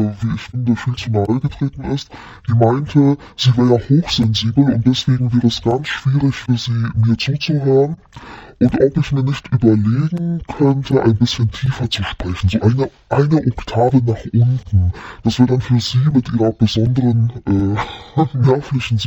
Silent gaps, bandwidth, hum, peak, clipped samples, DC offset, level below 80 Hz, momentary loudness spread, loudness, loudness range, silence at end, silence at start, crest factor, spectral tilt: none; 8 kHz; none; 0 dBFS; under 0.1%; under 0.1%; -38 dBFS; 7 LU; -16 LUFS; 2 LU; 0 s; 0 s; 16 dB; -7 dB/octave